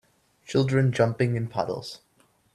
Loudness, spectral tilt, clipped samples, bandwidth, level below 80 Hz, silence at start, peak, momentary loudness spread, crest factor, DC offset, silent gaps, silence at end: -25 LUFS; -7 dB/octave; under 0.1%; 11.5 kHz; -60 dBFS; 0.5 s; -8 dBFS; 14 LU; 18 dB; under 0.1%; none; 0.6 s